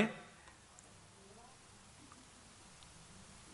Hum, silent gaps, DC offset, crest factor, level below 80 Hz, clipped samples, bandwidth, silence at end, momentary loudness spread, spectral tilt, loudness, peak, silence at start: none; none; under 0.1%; 30 dB; -72 dBFS; under 0.1%; 11.5 kHz; 0 s; 4 LU; -4.5 dB/octave; -52 LUFS; -18 dBFS; 0 s